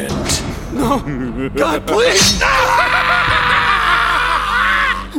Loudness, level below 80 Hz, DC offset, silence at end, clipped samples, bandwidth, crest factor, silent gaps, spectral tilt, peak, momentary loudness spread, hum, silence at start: -13 LUFS; -30 dBFS; under 0.1%; 0 s; under 0.1%; 17 kHz; 14 dB; none; -2.5 dB/octave; 0 dBFS; 9 LU; none; 0 s